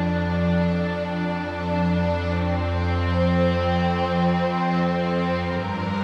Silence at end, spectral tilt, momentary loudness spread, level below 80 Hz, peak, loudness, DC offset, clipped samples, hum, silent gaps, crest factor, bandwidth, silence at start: 0 s; -8 dB/octave; 5 LU; -40 dBFS; -10 dBFS; -23 LUFS; under 0.1%; under 0.1%; none; none; 12 dB; 6.6 kHz; 0 s